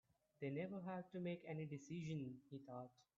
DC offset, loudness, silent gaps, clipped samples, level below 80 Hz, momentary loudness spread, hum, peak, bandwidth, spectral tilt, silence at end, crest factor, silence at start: under 0.1%; -51 LUFS; none; under 0.1%; -86 dBFS; 8 LU; none; -34 dBFS; 7.4 kHz; -7 dB/octave; 0.15 s; 16 dB; 0.4 s